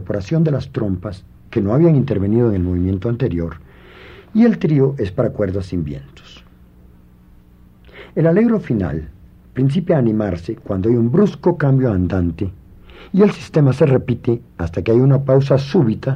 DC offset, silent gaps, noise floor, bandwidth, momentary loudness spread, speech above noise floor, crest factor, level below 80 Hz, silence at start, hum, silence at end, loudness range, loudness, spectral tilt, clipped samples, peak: under 0.1%; none; -46 dBFS; 7.2 kHz; 11 LU; 30 dB; 14 dB; -44 dBFS; 0 s; 60 Hz at -45 dBFS; 0 s; 5 LU; -17 LUFS; -9.5 dB/octave; under 0.1%; -2 dBFS